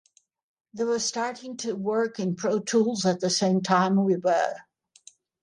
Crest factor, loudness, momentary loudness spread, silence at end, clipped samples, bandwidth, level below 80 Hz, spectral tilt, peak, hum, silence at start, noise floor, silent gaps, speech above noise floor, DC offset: 18 dB; -25 LUFS; 9 LU; 0.8 s; under 0.1%; 11 kHz; -74 dBFS; -4.5 dB/octave; -8 dBFS; none; 0.75 s; -55 dBFS; none; 31 dB; under 0.1%